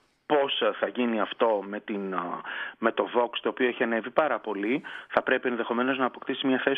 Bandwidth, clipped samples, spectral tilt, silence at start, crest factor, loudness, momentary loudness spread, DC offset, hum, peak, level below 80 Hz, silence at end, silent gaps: 5 kHz; under 0.1%; -7 dB/octave; 0.3 s; 22 dB; -28 LUFS; 6 LU; under 0.1%; none; -6 dBFS; -74 dBFS; 0 s; none